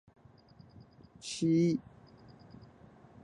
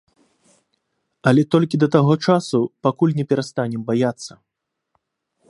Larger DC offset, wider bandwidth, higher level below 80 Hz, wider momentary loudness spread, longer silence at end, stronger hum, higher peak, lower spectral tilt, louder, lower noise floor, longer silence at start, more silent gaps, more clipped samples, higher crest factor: neither; about the same, 11 kHz vs 11 kHz; about the same, -68 dBFS vs -64 dBFS; first, 27 LU vs 8 LU; first, 1.45 s vs 1.25 s; neither; second, -20 dBFS vs 0 dBFS; about the same, -6.5 dB/octave vs -7 dB/octave; second, -31 LUFS vs -19 LUFS; second, -59 dBFS vs -80 dBFS; about the same, 1.25 s vs 1.25 s; neither; neither; about the same, 18 dB vs 20 dB